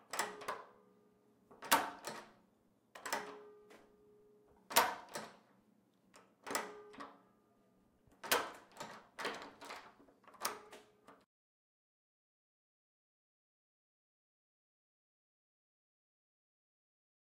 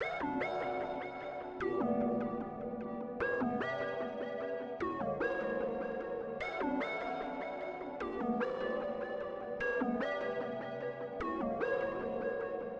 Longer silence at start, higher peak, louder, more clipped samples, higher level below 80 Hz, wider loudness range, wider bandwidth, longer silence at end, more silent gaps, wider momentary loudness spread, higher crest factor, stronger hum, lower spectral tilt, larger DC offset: about the same, 0.1 s vs 0 s; first, -14 dBFS vs -22 dBFS; about the same, -40 LUFS vs -38 LUFS; neither; second, -84 dBFS vs -64 dBFS; first, 10 LU vs 1 LU; first, 16 kHz vs 7.6 kHz; first, 6.1 s vs 0 s; neither; first, 23 LU vs 6 LU; first, 34 dB vs 14 dB; neither; second, -0.5 dB/octave vs -7 dB/octave; neither